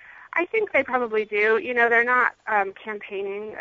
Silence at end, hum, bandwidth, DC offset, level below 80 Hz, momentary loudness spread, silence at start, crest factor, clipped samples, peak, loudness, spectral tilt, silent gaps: 0 s; none; 7.2 kHz; under 0.1%; -68 dBFS; 13 LU; 0.1 s; 18 dB; under 0.1%; -4 dBFS; -22 LUFS; -5 dB/octave; none